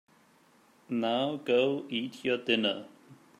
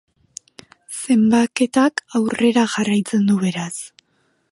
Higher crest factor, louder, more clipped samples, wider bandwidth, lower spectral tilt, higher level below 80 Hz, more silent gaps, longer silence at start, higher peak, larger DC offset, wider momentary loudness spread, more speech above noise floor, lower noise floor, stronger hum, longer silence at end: about the same, 20 dB vs 16 dB; second, -30 LUFS vs -18 LUFS; neither; first, 13 kHz vs 11.5 kHz; about the same, -5.5 dB/octave vs -5 dB/octave; second, -80 dBFS vs -62 dBFS; neither; about the same, 0.9 s vs 0.9 s; second, -12 dBFS vs -4 dBFS; neither; second, 8 LU vs 22 LU; second, 33 dB vs 47 dB; about the same, -63 dBFS vs -65 dBFS; neither; second, 0.25 s vs 0.65 s